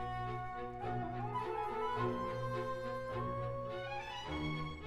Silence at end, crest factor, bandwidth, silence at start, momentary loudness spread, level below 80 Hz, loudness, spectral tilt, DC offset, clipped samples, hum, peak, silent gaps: 0 s; 14 dB; 12 kHz; 0 s; 5 LU; -56 dBFS; -40 LUFS; -7 dB/octave; under 0.1%; under 0.1%; 60 Hz at -55 dBFS; -26 dBFS; none